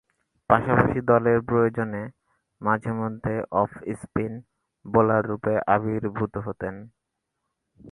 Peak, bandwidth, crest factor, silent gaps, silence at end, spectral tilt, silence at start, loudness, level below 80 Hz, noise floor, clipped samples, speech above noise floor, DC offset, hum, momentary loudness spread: -2 dBFS; 11 kHz; 24 dB; none; 0 s; -9.5 dB/octave; 0.5 s; -24 LUFS; -50 dBFS; -80 dBFS; under 0.1%; 57 dB; under 0.1%; none; 13 LU